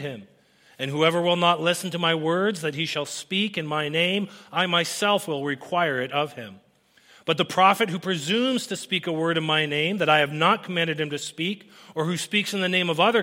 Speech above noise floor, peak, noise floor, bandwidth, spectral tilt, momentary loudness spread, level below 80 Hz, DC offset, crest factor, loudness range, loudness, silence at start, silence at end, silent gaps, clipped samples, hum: 34 dB; -4 dBFS; -58 dBFS; 16.5 kHz; -4 dB/octave; 9 LU; -72 dBFS; under 0.1%; 20 dB; 2 LU; -23 LUFS; 0 s; 0 s; none; under 0.1%; none